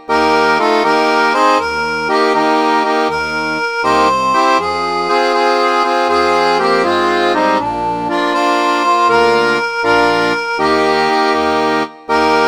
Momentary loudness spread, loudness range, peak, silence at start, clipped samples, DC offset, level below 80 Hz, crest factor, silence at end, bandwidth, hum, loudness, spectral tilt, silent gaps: 5 LU; 1 LU; 0 dBFS; 0 s; under 0.1%; 0.2%; -46 dBFS; 12 dB; 0 s; over 20 kHz; none; -13 LUFS; -4 dB/octave; none